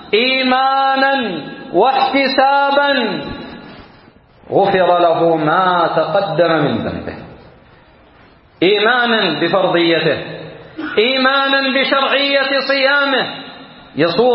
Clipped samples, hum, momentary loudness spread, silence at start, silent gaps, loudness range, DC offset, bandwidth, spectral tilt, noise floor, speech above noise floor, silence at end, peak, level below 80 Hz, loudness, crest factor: under 0.1%; none; 15 LU; 0 s; none; 3 LU; under 0.1%; 5.8 kHz; -9.5 dB/octave; -46 dBFS; 32 dB; 0 s; 0 dBFS; -52 dBFS; -14 LUFS; 14 dB